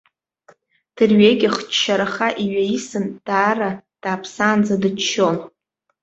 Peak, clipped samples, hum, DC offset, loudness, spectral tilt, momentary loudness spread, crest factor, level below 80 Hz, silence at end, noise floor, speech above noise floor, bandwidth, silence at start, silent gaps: -2 dBFS; under 0.1%; none; under 0.1%; -18 LUFS; -4.5 dB/octave; 12 LU; 18 dB; -60 dBFS; 0.55 s; -54 dBFS; 36 dB; 8 kHz; 0.95 s; none